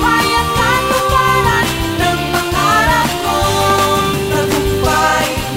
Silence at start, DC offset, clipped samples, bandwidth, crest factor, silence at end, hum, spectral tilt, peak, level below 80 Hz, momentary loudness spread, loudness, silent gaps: 0 s; under 0.1%; under 0.1%; 16.5 kHz; 12 dB; 0 s; none; -4 dB/octave; 0 dBFS; -28 dBFS; 4 LU; -13 LUFS; none